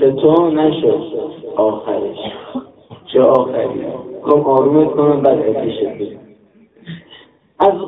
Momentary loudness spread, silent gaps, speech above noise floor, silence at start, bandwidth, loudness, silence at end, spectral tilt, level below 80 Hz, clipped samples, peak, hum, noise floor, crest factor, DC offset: 16 LU; none; 34 dB; 0 s; 4 kHz; -15 LUFS; 0 s; -10 dB/octave; -54 dBFS; under 0.1%; 0 dBFS; none; -48 dBFS; 16 dB; under 0.1%